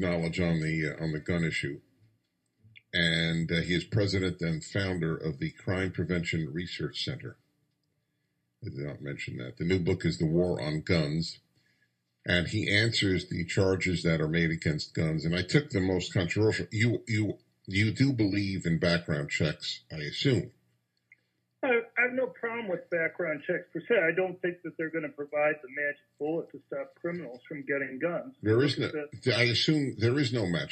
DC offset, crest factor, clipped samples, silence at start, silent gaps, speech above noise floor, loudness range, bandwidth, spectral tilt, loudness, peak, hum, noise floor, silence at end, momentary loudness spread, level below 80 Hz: under 0.1%; 22 dB; under 0.1%; 0 s; none; 49 dB; 5 LU; 8.8 kHz; -6 dB/octave; -30 LUFS; -8 dBFS; none; -78 dBFS; 0 s; 11 LU; -60 dBFS